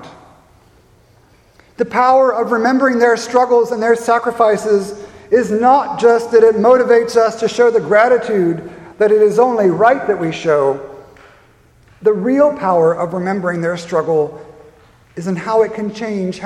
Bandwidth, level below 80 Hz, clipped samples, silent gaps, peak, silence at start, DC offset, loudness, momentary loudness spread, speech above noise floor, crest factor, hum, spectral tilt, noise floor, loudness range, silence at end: 12 kHz; -56 dBFS; under 0.1%; none; 0 dBFS; 0 s; under 0.1%; -14 LUFS; 10 LU; 36 dB; 14 dB; none; -6 dB/octave; -50 dBFS; 5 LU; 0 s